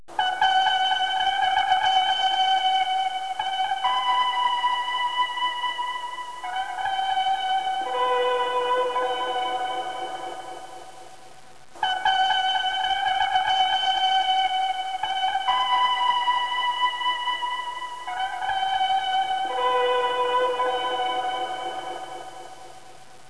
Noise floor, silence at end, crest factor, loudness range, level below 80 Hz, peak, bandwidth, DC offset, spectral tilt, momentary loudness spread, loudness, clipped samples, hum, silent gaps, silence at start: -49 dBFS; 0.15 s; 16 dB; 4 LU; -62 dBFS; -8 dBFS; 11 kHz; 0.6%; -0.5 dB/octave; 11 LU; -23 LUFS; under 0.1%; none; none; 0.1 s